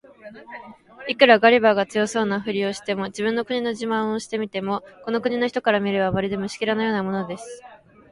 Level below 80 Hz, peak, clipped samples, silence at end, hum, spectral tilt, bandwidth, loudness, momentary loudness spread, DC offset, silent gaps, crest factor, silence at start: -58 dBFS; 0 dBFS; under 0.1%; 0.35 s; none; -5 dB/octave; 11.5 kHz; -22 LUFS; 19 LU; under 0.1%; none; 22 dB; 0.25 s